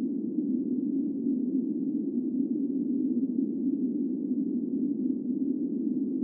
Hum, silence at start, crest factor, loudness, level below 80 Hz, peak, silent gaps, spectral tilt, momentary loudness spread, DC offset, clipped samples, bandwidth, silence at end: none; 0 s; 12 dB; -30 LUFS; -88 dBFS; -16 dBFS; none; -17 dB/octave; 2 LU; under 0.1%; under 0.1%; 1 kHz; 0 s